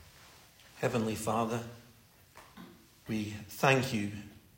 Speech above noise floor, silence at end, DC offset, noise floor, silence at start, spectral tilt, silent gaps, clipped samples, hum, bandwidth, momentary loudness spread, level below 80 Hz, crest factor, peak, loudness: 28 dB; 0.2 s; under 0.1%; -60 dBFS; 0 s; -5 dB/octave; none; under 0.1%; none; 16.5 kHz; 25 LU; -66 dBFS; 24 dB; -12 dBFS; -33 LUFS